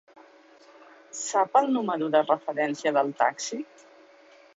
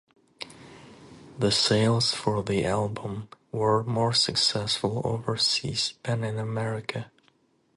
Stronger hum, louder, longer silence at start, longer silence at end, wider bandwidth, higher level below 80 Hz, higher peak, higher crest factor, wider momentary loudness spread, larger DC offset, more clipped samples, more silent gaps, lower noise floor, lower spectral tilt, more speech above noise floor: neither; about the same, -25 LUFS vs -25 LUFS; first, 1.15 s vs 0.4 s; first, 0.95 s vs 0.7 s; second, 8 kHz vs 11.5 kHz; second, -80 dBFS vs -56 dBFS; about the same, -8 dBFS vs -10 dBFS; about the same, 20 dB vs 18 dB; second, 12 LU vs 16 LU; neither; neither; neither; second, -55 dBFS vs -66 dBFS; about the same, -3.5 dB/octave vs -4.5 dB/octave; second, 29 dB vs 39 dB